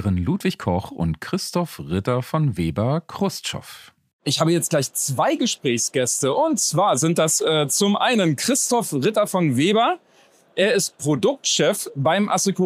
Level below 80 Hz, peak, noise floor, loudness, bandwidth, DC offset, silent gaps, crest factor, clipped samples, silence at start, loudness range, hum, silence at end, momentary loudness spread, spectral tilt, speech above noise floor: -50 dBFS; -4 dBFS; -55 dBFS; -21 LUFS; 15.5 kHz; under 0.1%; 4.13-4.19 s; 16 dB; under 0.1%; 0 s; 5 LU; none; 0 s; 8 LU; -4 dB/octave; 35 dB